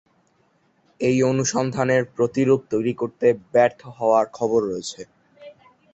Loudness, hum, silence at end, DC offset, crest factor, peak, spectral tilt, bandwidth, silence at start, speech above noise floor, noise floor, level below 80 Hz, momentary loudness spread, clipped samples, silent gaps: -21 LUFS; none; 0.45 s; under 0.1%; 18 dB; -4 dBFS; -5.5 dB/octave; 8.2 kHz; 1 s; 43 dB; -63 dBFS; -60 dBFS; 7 LU; under 0.1%; none